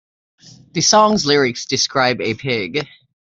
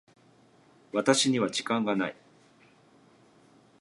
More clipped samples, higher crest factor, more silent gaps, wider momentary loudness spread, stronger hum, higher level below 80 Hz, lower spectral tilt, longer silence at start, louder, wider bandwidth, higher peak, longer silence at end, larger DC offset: neither; second, 18 dB vs 24 dB; neither; first, 12 LU vs 9 LU; neither; first, -56 dBFS vs -78 dBFS; about the same, -3 dB/octave vs -3.5 dB/octave; second, 0.75 s vs 0.95 s; first, -16 LUFS vs -27 LUFS; second, 8 kHz vs 11.5 kHz; first, -2 dBFS vs -8 dBFS; second, 0.4 s vs 1.7 s; neither